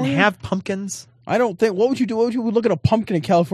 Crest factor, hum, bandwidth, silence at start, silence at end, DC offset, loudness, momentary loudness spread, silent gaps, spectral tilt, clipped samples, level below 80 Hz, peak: 18 dB; none; 13 kHz; 0 s; 0 s; under 0.1%; -20 LUFS; 8 LU; none; -6 dB/octave; under 0.1%; -46 dBFS; 0 dBFS